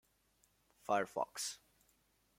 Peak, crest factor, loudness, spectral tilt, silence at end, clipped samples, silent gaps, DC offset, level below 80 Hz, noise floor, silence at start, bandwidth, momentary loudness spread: -22 dBFS; 22 dB; -40 LUFS; -2 dB/octave; 0.8 s; under 0.1%; none; under 0.1%; -82 dBFS; -76 dBFS; 0.9 s; 16.5 kHz; 17 LU